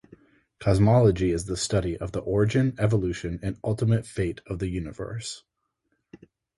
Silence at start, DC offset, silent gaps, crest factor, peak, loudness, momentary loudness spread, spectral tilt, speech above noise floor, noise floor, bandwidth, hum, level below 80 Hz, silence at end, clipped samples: 0.6 s; under 0.1%; none; 18 dB; -8 dBFS; -25 LUFS; 14 LU; -6.5 dB/octave; 52 dB; -76 dBFS; 11.5 kHz; none; -42 dBFS; 0.4 s; under 0.1%